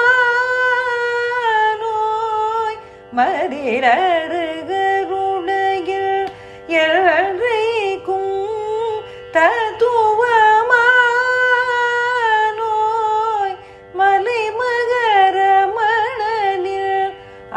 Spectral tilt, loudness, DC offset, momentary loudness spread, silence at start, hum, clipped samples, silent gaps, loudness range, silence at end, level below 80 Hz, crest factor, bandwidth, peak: -3.5 dB/octave; -16 LUFS; under 0.1%; 9 LU; 0 s; none; under 0.1%; none; 4 LU; 0 s; -56 dBFS; 16 dB; 10.5 kHz; -2 dBFS